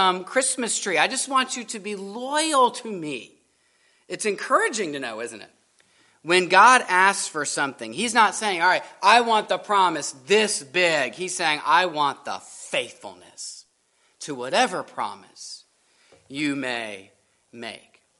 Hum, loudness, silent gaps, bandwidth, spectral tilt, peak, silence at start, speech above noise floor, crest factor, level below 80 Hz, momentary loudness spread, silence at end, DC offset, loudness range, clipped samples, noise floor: none; -21 LUFS; none; 11.5 kHz; -1.5 dB/octave; -2 dBFS; 0 s; 43 dB; 22 dB; -78 dBFS; 19 LU; 0.4 s; under 0.1%; 10 LU; under 0.1%; -65 dBFS